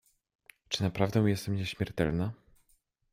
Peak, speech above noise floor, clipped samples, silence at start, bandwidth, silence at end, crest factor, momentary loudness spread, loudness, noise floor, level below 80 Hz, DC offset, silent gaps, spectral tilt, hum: -12 dBFS; 41 dB; under 0.1%; 0.7 s; 16 kHz; 0.75 s; 20 dB; 7 LU; -31 LUFS; -71 dBFS; -54 dBFS; under 0.1%; none; -6 dB/octave; none